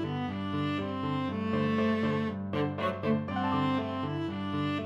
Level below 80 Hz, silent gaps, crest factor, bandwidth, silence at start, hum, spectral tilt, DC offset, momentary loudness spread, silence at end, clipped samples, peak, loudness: -64 dBFS; none; 14 dB; 8 kHz; 0 s; none; -8 dB/octave; under 0.1%; 5 LU; 0 s; under 0.1%; -16 dBFS; -31 LUFS